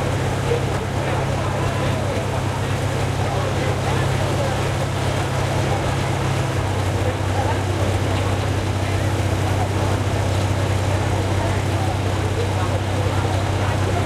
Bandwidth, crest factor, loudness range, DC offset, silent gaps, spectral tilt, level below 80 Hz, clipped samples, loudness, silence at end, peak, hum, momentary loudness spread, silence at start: 14 kHz; 12 dB; 1 LU; under 0.1%; none; -5.5 dB/octave; -34 dBFS; under 0.1%; -21 LUFS; 0 s; -8 dBFS; none; 1 LU; 0 s